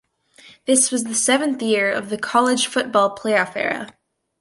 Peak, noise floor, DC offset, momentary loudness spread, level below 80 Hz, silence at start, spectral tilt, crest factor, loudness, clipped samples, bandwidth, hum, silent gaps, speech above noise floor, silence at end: -4 dBFS; -50 dBFS; under 0.1%; 8 LU; -68 dBFS; 0.45 s; -2 dB/octave; 18 dB; -19 LUFS; under 0.1%; 11.5 kHz; none; none; 30 dB; 0.5 s